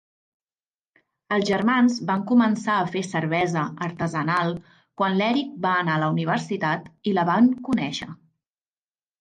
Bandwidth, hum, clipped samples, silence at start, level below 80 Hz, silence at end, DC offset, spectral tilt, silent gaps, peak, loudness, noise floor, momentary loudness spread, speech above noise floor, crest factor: 9.4 kHz; none; under 0.1%; 1.3 s; -64 dBFS; 1.05 s; under 0.1%; -6 dB/octave; none; -8 dBFS; -23 LUFS; under -90 dBFS; 8 LU; over 68 dB; 16 dB